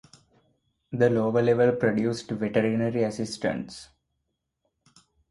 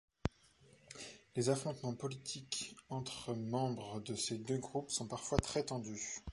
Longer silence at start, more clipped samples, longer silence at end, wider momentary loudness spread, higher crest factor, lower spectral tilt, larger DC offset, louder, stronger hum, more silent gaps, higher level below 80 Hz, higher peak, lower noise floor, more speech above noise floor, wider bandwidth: first, 0.9 s vs 0.25 s; neither; first, 1.45 s vs 0 s; first, 13 LU vs 8 LU; second, 18 dB vs 28 dB; first, -6.5 dB/octave vs -4.5 dB/octave; neither; first, -25 LUFS vs -41 LUFS; neither; neither; about the same, -62 dBFS vs -58 dBFS; first, -8 dBFS vs -14 dBFS; first, -79 dBFS vs -67 dBFS; first, 55 dB vs 27 dB; about the same, 11.5 kHz vs 11.5 kHz